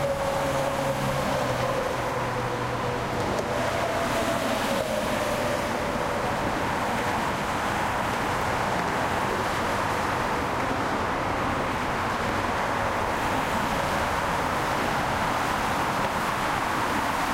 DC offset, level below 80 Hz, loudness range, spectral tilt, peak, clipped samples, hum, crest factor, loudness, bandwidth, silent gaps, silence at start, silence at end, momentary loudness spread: under 0.1%; -44 dBFS; 1 LU; -4.5 dB/octave; -12 dBFS; under 0.1%; none; 14 dB; -26 LUFS; 16 kHz; none; 0 s; 0 s; 2 LU